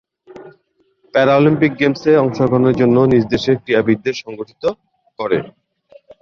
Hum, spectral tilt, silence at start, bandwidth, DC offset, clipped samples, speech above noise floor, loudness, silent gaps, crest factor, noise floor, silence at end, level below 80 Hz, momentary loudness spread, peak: none; -7.5 dB/octave; 0.35 s; 7 kHz; under 0.1%; under 0.1%; 46 dB; -15 LUFS; none; 14 dB; -60 dBFS; 0.75 s; -50 dBFS; 13 LU; -2 dBFS